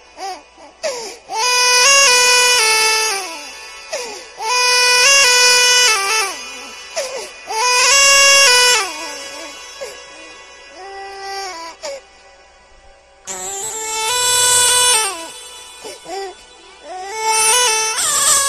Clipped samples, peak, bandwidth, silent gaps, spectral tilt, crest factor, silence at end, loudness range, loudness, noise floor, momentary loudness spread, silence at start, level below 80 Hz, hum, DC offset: under 0.1%; 0 dBFS; 16 kHz; none; 2.5 dB/octave; 16 dB; 0 s; 17 LU; -11 LUFS; -46 dBFS; 23 LU; 0.15 s; -52 dBFS; none; under 0.1%